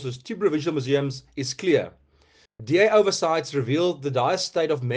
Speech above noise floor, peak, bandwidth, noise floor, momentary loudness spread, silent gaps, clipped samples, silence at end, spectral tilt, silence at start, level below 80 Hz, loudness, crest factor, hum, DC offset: 36 dB; -6 dBFS; 9.6 kHz; -59 dBFS; 12 LU; none; under 0.1%; 0 s; -5 dB/octave; 0 s; -64 dBFS; -23 LUFS; 18 dB; none; under 0.1%